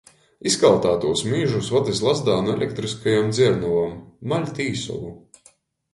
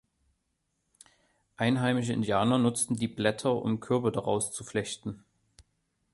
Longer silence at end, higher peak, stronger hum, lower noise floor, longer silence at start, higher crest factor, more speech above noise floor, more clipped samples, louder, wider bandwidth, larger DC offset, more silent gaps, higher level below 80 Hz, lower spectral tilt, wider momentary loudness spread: first, 0.75 s vs 0.5 s; first, -2 dBFS vs -10 dBFS; neither; second, -57 dBFS vs -79 dBFS; second, 0.45 s vs 1.6 s; about the same, 20 dB vs 20 dB; second, 36 dB vs 50 dB; neither; first, -21 LUFS vs -29 LUFS; about the same, 11.5 kHz vs 12 kHz; neither; neither; first, -52 dBFS vs -64 dBFS; about the same, -5 dB/octave vs -5 dB/octave; first, 12 LU vs 8 LU